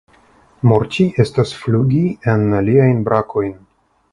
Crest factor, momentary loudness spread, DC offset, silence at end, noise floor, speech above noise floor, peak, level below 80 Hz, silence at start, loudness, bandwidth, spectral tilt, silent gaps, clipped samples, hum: 16 dB; 6 LU; under 0.1%; 0.6 s; -50 dBFS; 36 dB; 0 dBFS; -44 dBFS; 0.65 s; -16 LUFS; 11 kHz; -8 dB/octave; none; under 0.1%; none